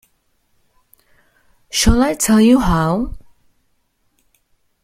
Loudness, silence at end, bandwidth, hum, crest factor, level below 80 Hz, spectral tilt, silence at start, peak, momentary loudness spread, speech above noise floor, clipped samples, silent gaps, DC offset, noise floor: -15 LUFS; 1.65 s; 16 kHz; none; 16 dB; -30 dBFS; -4.5 dB/octave; 1.75 s; -2 dBFS; 11 LU; 50 dB; under 0.1%; none; under 0.1%; -64 dBFS